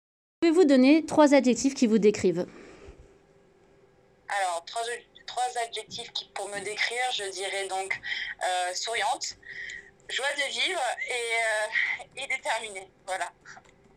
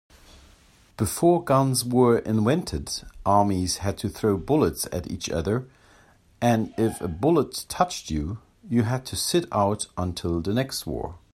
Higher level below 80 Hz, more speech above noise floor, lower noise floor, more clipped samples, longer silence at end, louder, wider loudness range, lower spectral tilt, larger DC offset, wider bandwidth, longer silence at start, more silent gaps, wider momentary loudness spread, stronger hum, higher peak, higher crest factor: second, -66 dBFS vs -46 dBFS; about the same, 34 dB vs 32 dB; first, -60 dBFS vs -56 dBFS; neither; first, 0.4 s vs 0.15 s; about the same, -27 LUFS vs -25 LUFS; first, 10 LU vs 4 LU; second, -3 dB/octave vs -5.5 dB/octave; neither; about the same, 15 kHz vs 16 kHz; second, 0.4 s vs 1 s; neither; first, 15 LU vs 9 LU; neither; second, -8 dBFS vs -4 dBFS; about the same, 20 dB vs 20 dB